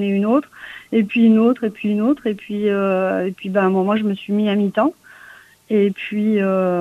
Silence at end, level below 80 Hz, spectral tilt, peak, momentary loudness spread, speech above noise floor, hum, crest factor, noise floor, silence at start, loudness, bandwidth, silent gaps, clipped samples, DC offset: 0 s; -62 dBFS; -8 dB/octave; -4 dBFS; 7 LU; 27 dB; none; 14 dB; -45 dBFS; 0 s; -18 LUFS; 4.3 kHz; none; under 0.1%; under 0.1%